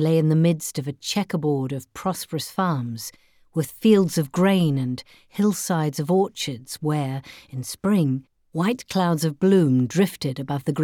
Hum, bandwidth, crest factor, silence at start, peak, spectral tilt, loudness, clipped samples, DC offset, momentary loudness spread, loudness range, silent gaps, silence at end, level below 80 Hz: none; 18 kHz; 16 dB; 0 s; -6 dBFS; -6 dB/octave; -23 LUFS; under 0.1%; under 0.1%; 12 LU; 3 LU; none; 0 s; -62 dBFS